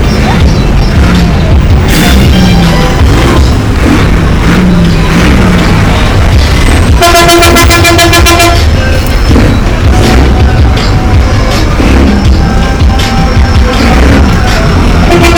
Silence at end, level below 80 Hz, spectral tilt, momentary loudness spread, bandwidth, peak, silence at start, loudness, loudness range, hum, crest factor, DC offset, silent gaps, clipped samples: 0 s; -8 dBFS; -5.5 dB/octave; 5 LU; over 20 kHz; 0 dBFS; 0 s; -5 LUFS; 3 LU; none; 4 dB; under 0.1%; none; 1%